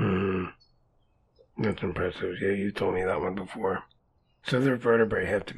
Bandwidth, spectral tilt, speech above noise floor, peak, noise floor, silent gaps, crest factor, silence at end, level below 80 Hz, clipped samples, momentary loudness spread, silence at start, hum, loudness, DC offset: 12 kHz; -7.5 dB/octave; 40 dB; -10 dBFS; -67 dBFS; none; 18 dB; 0 s; -54 dBFS; under 0.1%; 9 LU; 0 s; none; -28 LUFS; under 0.1%